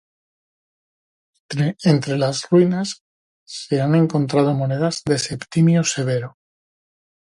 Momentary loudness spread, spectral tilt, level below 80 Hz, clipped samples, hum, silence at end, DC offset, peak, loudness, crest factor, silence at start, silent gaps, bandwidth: 12 LU; -6 dB/octave; -60 dBFS; under 0.1%; none; 1 s; under 0.1%; -2 dBFS; -19 LUFS; 18 dB; 1.5 s; 3.01-3.46 s; 11.5 kHz